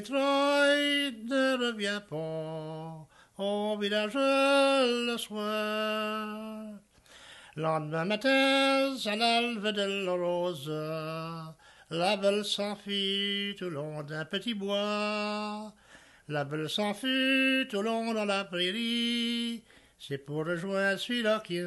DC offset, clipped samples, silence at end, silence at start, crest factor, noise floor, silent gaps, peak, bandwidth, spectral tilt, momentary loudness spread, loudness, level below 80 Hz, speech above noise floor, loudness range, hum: under 0.1%; under 0.1%; 0 s; 0 s; 18 dB; -56 dBFS; none; -12 dBFS; 12.5 kHz; -4 dB/octave; 14 LU; -29 LUFS; -72 dBFS; 26 dB; 4 LU; none